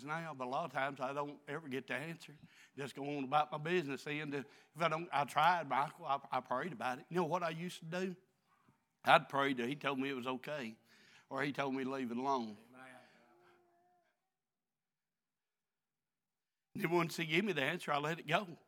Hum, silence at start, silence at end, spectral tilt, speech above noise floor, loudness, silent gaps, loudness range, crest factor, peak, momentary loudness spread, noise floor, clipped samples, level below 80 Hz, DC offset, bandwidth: none; 0 s; 0.1 s; -5 dB/octave; over 52 dB; -38 LUFS; none; 7 LU; 28 dB; -10 dBFS; 15 LU; under -90 dBFS; under 0.1%; under -90 dBFS; under 0.1%; 18.5 kHz